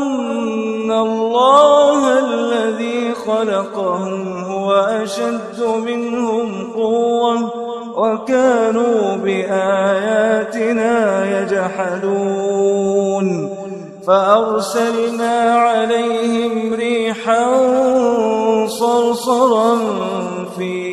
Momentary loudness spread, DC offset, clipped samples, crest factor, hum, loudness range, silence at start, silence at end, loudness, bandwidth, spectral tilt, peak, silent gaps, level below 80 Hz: 8 LU; under 0.1%; under 0.1%; 16 dB; none; 4 LU; 0 s; 0 s; -16 LUFS; 13 kHz; -5 dB/octave; 0 dBFS; none; -62 dBFS